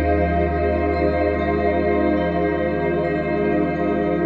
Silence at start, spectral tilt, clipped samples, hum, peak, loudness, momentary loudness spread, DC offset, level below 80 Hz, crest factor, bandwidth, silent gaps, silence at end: 0 s; -10 dB/octave; under 0.1%; none; -6 dBFS; -20 LUFS; 2 LU; under 0.1%; -30 dBFS; 12 dB; 5.6 kHz; none; 0 s